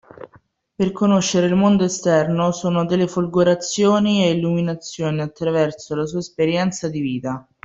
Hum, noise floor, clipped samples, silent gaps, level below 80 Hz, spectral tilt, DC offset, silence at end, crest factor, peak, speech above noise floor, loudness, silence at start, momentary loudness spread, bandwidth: none; -54 dBFS; under 0.1%; none; -56 dBFS; -5.5 dB/octave; under 0.1%; 0.25 s; 16 dB; -4 dBFS; 36 dB; -19 LUFS; 0.2 s; 8 LU; 8 kHz